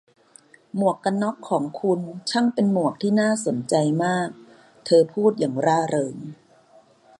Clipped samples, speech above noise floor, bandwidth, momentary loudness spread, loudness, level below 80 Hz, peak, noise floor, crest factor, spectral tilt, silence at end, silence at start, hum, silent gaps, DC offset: under 0.1%; 33 dB; 11.5 kHz; 9 LU; -22 LUFS; -70 dBFS; -6 dBFS; -54 dBFS; 18 dB; -5.5 dB/octave; 0.85 s; 0.75 s; none; none; under 0.1%